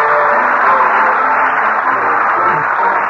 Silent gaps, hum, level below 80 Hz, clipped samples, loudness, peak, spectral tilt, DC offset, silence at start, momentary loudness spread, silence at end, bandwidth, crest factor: none; none; -54 dBFS; under 0.1%; -11 LUFS; -2 dBFS; -5.5 dB/octave; under 0.1%; 0 s; 3 LU; 0 s; 7.6 kHz; 10 dB